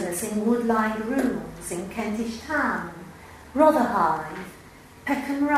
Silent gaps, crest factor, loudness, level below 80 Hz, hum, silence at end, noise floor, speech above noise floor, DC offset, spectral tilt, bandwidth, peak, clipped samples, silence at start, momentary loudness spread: none; 20 dB; -25 LUFS; -52 dBFS; none; 0 s; -44 dBFS; 20 dB; under 0.1%; -5 dB/octave; 16 kHz; -4 dBFS; under 0.1%; 0 s; 18 LU